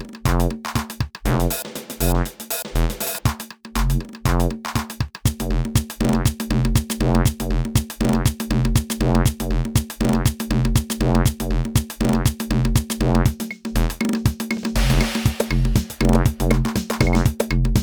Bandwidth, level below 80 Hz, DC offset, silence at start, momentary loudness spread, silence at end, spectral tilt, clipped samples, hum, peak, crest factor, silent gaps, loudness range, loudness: over 20 kHz; -24 dBFS; under 0.1%; 0 s; 6 LU; 0 s; -5.5 dB/octave; under 0.1%; none; -2 dBFS; 18 dB; none; 3 LU; -21 LUFS